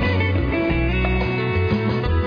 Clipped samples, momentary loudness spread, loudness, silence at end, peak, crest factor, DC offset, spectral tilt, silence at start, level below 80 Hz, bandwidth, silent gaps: under 0.1%; 1 LU; -20 LUFS; 0 s; -8 dBFS; 10 dB; under 0.1%; -9 dB/octave; 0 s; -26 dBFS; 5.2 kHz; none